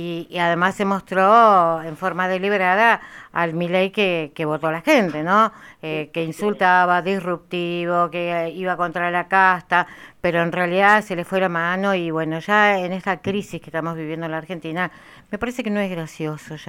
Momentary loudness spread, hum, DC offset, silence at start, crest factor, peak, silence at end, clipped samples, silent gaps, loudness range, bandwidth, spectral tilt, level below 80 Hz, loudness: 12 LU; none; under 0.1%; 0 s; 18 dB; -2 dBFS; 0.05 s; under 0.1%; none; 5 LU; 16.5 kHz; -5.5 dB/octave; -58 dBFS; -20 LUFS